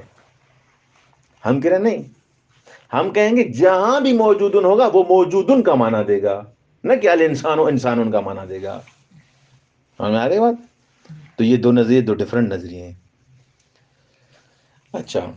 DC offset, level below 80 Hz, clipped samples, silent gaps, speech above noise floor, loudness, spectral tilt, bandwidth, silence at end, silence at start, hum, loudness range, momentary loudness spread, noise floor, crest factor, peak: under 0.1%; -64 dBFS; under 0.1%; none; 44 dB; -17 LUFS; -7 dB/octave; 7.6 kHz; 0 s; 1.45 s; none; 8 LU; 15 LU; -60 dBFS; 16 dB; -2 dBFS